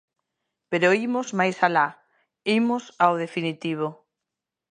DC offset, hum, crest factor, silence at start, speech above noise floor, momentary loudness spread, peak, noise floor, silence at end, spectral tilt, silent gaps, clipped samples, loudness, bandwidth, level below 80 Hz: under 0.1%; none; 22 dB; 0.7 s; 63 dB; 8 LU; -4 dBFS; -86 dBFS; 0.75 s; -5.5 dB/octave; none; under 0.1%; -24 LUFS; 9.8 kHz; -78 dBFS